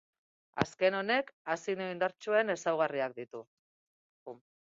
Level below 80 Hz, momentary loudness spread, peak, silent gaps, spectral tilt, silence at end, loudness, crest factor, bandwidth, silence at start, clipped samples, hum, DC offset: -72 dBFS; 20 LU; -10 dBFS; 1.33-1.45 s, 3.47-4.26 s; -4.5 dB/octave; 0.3 s; -32 LUFS; 24 dB; 7.8 kHz; 0.55 s; under 0.1%; none; under 0.1%